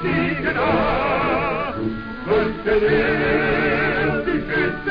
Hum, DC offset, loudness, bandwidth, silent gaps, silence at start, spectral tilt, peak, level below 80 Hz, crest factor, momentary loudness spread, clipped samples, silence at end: none; 0.5%; -20 LUFS; 5.2 kHz; none; 0 s; -8.5 dB/octave; -6 dBFS; -36 dBFS; 12 dB; 6 LU; under 0.1%; 0 s